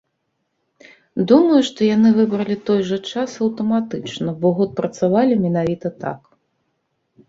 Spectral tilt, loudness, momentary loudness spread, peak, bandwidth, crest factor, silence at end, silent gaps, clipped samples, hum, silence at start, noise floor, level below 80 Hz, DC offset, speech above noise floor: -7 dB/octave; -18 LUFS; 12 LU; 0 dBFS; 7.6 kHz; 18 dB; 1.1 s; none; under 0.1%; none; 1.15 s; -72 dBFS; -58 dBFS; under 0.1%; 55 dB